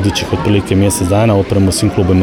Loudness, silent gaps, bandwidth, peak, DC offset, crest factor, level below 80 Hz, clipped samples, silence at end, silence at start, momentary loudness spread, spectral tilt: -12 LUFS; none; 17 kHz; -2 dBFS; under 0.1%; 10 dB; -32 dBFS; under 0.1%; 0 s; 0 s; 3 LU; -5.5 dB/octave